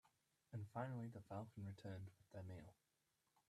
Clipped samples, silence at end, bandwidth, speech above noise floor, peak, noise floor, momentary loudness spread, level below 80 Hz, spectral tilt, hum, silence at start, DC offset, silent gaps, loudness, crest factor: under 0.1%; 0.75 s; 13.5 kHz; 34 dB; -34 dBFS; -87 dBFS; 9 LU; -84 dBFS; -8 dB/octave; none; 0.05 s; under 0.1%; none; -54 LUFS; 20 dB